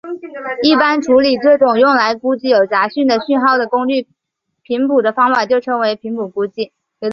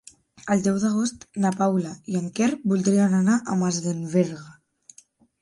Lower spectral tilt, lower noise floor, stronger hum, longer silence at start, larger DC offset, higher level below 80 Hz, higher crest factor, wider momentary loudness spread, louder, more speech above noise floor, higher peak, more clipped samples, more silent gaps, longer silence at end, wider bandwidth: second, -4.5 dB/octave vs -6 dB/octave; first, -75 dBFS vs -56 dBFS; neither; second, 0.05 s vs 0.45 s; neither; first, -58 dBFS vs -64 dBFS; about the same, 14 dB vs 16 dB; about the same, 11 LU vs 9 LU; first, -14 LUFS vs -23 LUFS; first, 61 dB vs 34 dB; first, -2 dBFS vs -8 dBFS; neither; neither; second, 0 s vs 0.9 s; second, 7.2 kHz vs 11.5 kHz